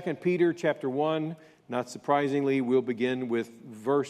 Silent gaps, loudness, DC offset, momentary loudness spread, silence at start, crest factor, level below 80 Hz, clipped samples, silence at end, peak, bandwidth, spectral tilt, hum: none; -28 LUFS; under 0.1%; 10 LU; 0 s; 16 dB; -78 dBFS; under 0.1%; 0 s; -12 dBFS; 12.5 kHz; -6.5 dB/octave; none